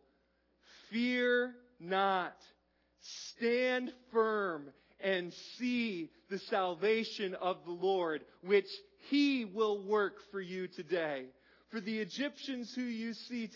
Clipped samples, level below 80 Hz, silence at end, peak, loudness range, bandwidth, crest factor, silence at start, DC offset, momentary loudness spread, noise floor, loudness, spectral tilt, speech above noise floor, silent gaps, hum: under 0.1%; -84 dBFS; 0 s; -18 dBFS; 3 LU; 6 kHz; 18 dB; 0.75 s; under 0.1%; 12 LU; -75 dBFS; -35 LUFS; -5 dB/octave; 40 dB; none; none